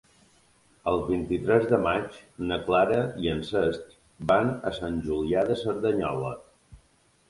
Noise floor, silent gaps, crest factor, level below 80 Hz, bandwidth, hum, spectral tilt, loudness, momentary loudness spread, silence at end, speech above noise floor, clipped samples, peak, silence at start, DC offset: -64 dBFS; none; 20 dB; -50 dBFS; 11.5 kHz; none; -7 dB/octave; -27 LUFS; 11 LU; 0.55 s; 38 dB; under 0.1%; -6 dBFS; 0.85 s; under 0.1%